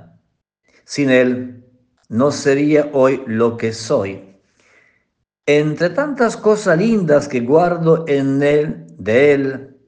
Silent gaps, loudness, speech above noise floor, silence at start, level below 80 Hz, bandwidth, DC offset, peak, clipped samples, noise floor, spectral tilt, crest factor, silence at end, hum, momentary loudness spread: none; -16 LUFS; 54 dB; 0.9 s; -58 dBFS; 9.6 kHz; under 0.1%; 0 dBFS; under 0.1%; -69 dBFS; -6 dB/octave; 16 dB; 0.2 s; none; 11 LU